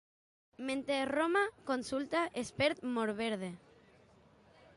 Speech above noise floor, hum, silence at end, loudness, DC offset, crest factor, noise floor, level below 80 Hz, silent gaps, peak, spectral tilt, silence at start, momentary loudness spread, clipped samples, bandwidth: 29 dB; none; 1.2 s; -35 LUFS; under 0.1%; 18 dB; -64 dBFS; -70 dBFS; none; -18 dBFS; -4.5 dB/octave; 0.6 s; 9 LU; under 0.1%; 11.5 kHz